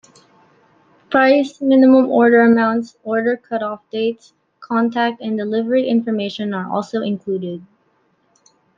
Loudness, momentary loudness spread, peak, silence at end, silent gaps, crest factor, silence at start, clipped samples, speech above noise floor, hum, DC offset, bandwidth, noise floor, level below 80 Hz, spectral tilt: -17 LUFS; 12 LU; -2 dBFS; 1.15 s; none; 16 dB; 1.1 s; under 0.1%; 45 dB; none; under 0.1%; 7.4 kHz; -61 dBFS; -66 dBFS; -7 dB/octave